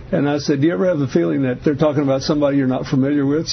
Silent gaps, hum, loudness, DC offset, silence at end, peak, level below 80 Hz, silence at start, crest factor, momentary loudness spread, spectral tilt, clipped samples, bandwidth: none; none; -18 LUFS; under 0.1%; 0 s; -4 dBFS; -46 dBFS; 0 s; 14 dB; 2 LU; -6.5 dB/octave; under 0.1%; 6.4 kHz